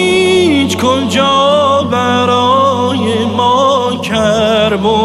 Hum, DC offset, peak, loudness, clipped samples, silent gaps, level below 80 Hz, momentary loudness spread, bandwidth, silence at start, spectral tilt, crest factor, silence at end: none; under 0.1%; 0 dBFS; -11 LUFS; under 0.1%; none; -42 dBFS; 4 LU; 15.5 kHz; 0 s; -4.5 dB/octave; 10 dB; 0 s